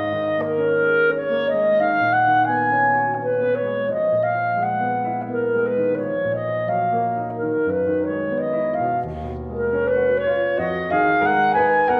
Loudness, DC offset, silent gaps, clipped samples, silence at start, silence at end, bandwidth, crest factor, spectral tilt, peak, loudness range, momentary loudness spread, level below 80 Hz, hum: -20 LUFS; under 0.1%; none; under 0.1%; 0 s; 0 s; 4.7 kHz; 12 dB; -9 dB/octave; -8 dBFS; 4 LU; 6 LU; -48 dBFS; none